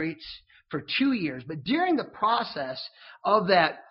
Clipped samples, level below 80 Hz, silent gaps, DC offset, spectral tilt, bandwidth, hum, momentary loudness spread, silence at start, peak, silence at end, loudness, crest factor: under 0.1%; -66 dBFS; none; under 0.1%; -2.5 dB/octave; 5.8 kHz; none; 17 LU; 0 s; -8 dBFS; 0.1 s; -26 LUFS; 20 dB